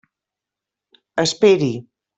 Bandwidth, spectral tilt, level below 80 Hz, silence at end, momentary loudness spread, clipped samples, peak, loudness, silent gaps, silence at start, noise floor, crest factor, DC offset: 8.4 kHz; -4.5 dB/octave; -62 dBFS; 0.35 s; 13 LU; under 0.1%; -2 dBFS; -17 LUFS; none; 1.15 s; -86 dBFS; 18 dB; under 0.1%